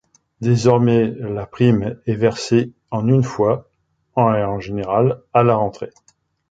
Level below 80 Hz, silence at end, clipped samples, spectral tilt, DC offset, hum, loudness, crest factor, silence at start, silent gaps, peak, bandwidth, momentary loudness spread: -48 dBFS; 0.6 s; under 0.1%; -7.5 dB/octave; under 0.1%; none; -18 LUFS; 16 dB; 0.4 s; none; -2 dBFS; 7.8 kHz; 10 LU